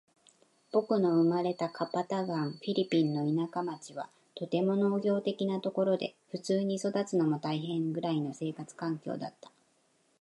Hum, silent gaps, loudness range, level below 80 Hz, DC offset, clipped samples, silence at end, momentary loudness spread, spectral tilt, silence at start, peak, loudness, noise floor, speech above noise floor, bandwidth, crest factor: none; none; 3 LU; -82 dBFS; under 0.1%; under 0.1%; 0.9 s; 11 LU; -7 dB/octave; 0.75 s; -16 dBFS; -32 LUFS; -71 dBFS; 40 dB; 11.5 kHz; 16 dB